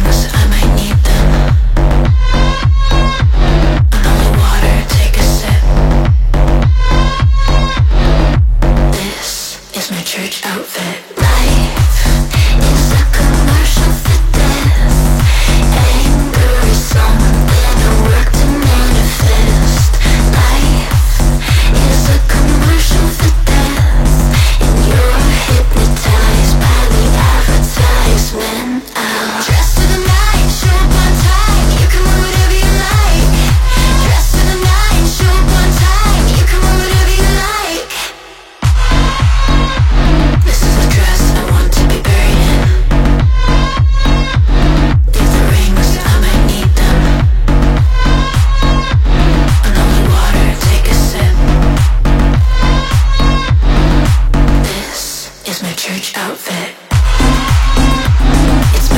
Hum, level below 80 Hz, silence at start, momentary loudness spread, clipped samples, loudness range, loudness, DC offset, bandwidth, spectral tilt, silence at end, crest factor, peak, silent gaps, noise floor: none; -10 dBFS; 0 s; 4 LU; under 0.1%; 2 LU; -11 LUFS; 0.8%; 17 kHz; -5 dB/octave; 0 s; 8 dB; 0 dBFS; none; -33 dBFS